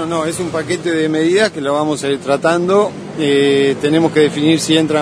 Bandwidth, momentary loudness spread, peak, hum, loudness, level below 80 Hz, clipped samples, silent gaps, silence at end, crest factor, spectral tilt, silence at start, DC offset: 11 kHz; 6 LU; 0 dBFS; none; -15 LUFS; -54 dBFS; under 0.1%; none; 0 s; 14 dB; -5 dB/octave; 0 s; under 0.1%